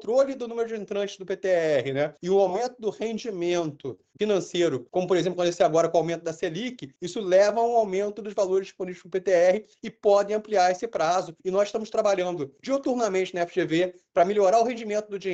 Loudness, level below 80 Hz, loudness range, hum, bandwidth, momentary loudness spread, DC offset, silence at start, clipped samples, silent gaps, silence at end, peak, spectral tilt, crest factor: -25 LUFS; -68 dBFS; 2 LU; none; 8.4 kHz; 10 LU; under 0.1%; 0 s; under 0.1%; none; 0 s; -8 dBFS; -5 dB/octave; 16 dB